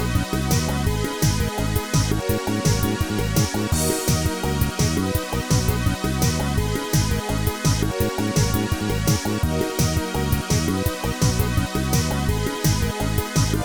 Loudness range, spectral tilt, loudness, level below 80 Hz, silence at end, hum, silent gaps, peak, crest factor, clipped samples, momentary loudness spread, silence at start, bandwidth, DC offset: 0 LU; -5 dB/octave; -22 LUFS; -30 dBFS; 0 s; none; none; -6 dBFS; 16 dB; under 0.1%; 3 LU; 0 s; 19.5 kHz; 0.7%